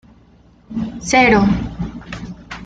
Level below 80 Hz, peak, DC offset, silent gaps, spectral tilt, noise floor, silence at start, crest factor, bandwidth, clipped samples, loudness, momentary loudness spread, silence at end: -36 dBFS; -2 dBFS; under 0.1%; none; -5 dB/octave; -49 dBFS; 0.7 s; 18 dB; 9 kHz; under 0.1%; -16 LUFS; 20 LU; 0 s